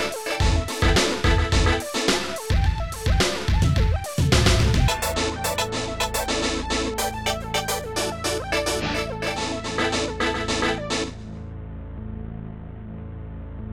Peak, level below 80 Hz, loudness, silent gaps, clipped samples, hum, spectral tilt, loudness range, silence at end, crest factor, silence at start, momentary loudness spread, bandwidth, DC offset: -6 dBFS; -28 dBFS; -23 LUFS; none; under 0.1%; none; -4 dB/octave; 5 LU; 0 s; 18 dB; 0 s; 17 LU; 19 kHz; under 0.1%